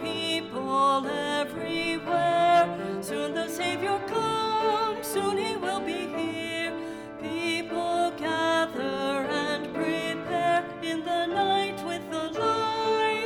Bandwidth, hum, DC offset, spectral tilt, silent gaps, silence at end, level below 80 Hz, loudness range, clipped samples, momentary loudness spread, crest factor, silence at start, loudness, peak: 17.5 kHz; none; under 0.1%; -4 dB/octave; none; 0 s; -64 dBFS; 3 LU; under 0.1%; 8 LU; 16 dB; 0 s; -27 LUFS; -12 dBFS